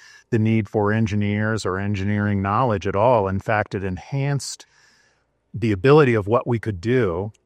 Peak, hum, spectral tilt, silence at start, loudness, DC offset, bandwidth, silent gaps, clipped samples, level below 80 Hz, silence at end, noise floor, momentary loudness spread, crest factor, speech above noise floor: -2 dBFS; none; -7 dB/octave; 0.3 s; -21 LUFS; under 0.1%; 10.5 kHz; none; under 0.1%; -54 dBFS; 0.15 s; -64 dBFS; 11 LU; 18 dB; 44 dB